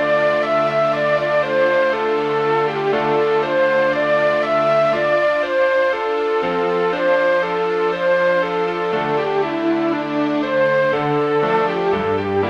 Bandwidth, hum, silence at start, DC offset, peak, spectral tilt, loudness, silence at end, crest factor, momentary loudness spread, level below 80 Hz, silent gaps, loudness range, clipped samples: 8.2 kHz; none; 0 s; under 0.1%; -6 dBFS; -6.5 dB/octave; -18 LUFS; 0 s; 12 dB; 3 LU; -56 dBFS; none; 2 LU; under 0.1%